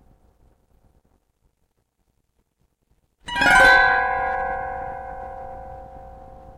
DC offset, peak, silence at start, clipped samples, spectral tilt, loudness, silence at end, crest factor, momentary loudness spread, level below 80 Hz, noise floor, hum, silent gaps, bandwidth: under 0.1%; -4 dBFS; 3.25 s; under 0.1%; -2.5 dB/octave; -17 LUFS; 0.05 s; 20 dB; 26 LU; -44 dBFS; -70 dBFS; none; none; 16.5 kHz